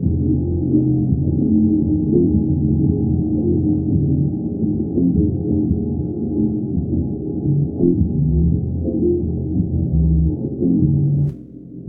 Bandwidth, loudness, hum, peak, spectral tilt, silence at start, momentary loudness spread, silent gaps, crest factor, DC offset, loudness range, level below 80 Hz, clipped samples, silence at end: 1.1 kHz; -18 LUFS; none; -2 dBFS; -16.5 dB/octave; 0 s; 6 LU; none; 14 dB; under 0.1%; 2 LU; -28 dBFS; under 0.1%; 0 s